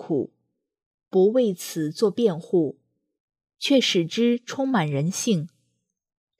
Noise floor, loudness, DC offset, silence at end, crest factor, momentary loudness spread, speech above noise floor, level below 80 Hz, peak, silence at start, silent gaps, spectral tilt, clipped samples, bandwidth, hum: -75 dBFS; -23 LUFS; under 0.1%; 0.9 s; 16 dB; 9 LU; 53 dB; -78 dBFS; -8 dBFS; 0 s; 0.86-0.98 s, 3.20-3.28 s; -5 dB/octave; under 0.1%; 15.5 kHz; none